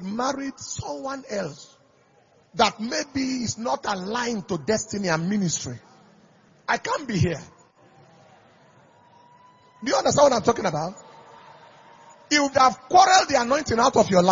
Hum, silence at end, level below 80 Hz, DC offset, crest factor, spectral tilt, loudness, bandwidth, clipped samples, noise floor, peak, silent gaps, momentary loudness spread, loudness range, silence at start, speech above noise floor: none; 0 s; -56 dBFS; under 0.1%; 22 dB; -4 dB/octave; -23 LUFS; 7.6 kHz; under 0.1%; -59 dBFS; -2 dBFS; none; 14 LU; 9 LU; 0 s; 37 dB